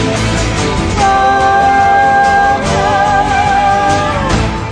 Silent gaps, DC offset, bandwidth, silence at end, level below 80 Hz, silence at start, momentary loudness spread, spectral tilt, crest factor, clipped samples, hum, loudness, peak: none; under 0.1%; 10.5 kHz; 0 s; -24 dBFS; 0 s; 5 LU; -4.5 dB/octave; 10 dB; under 0.1%; none; -10 LUFS; 0 dBFS